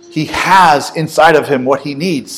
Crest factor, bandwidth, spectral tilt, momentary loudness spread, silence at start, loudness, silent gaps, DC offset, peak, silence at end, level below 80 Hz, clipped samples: 12 dB; over 20 kHz; -4.5 dB/octave; 9 LU; 0.1 s; -11 LUFS; none; under 0.1%; 0 dBFS; 0 s; -46 dBFS; 1%